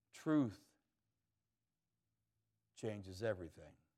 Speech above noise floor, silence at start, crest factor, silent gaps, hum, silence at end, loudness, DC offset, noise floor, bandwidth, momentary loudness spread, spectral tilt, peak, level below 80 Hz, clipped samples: over 49 dB; 0.15 s; 20 dB; none; none; 0.25 s; -42 LUFS; under 0.1%; under -90 dBFS; 13 kHz; 21 LU; -7 dB/octave; -26 dBFS; -82 dBFS; under 0.1%